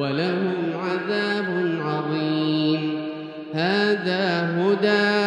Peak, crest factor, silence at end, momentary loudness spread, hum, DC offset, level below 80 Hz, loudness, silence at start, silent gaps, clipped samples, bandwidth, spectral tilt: -8 dBFS; 16 dB; 0 s; 7 LU; none; under 0.1%; -74 dBFS; -23 LUFS; 0 s; none; under 0.1%; 9.8 kHz; -6.5 dB/octave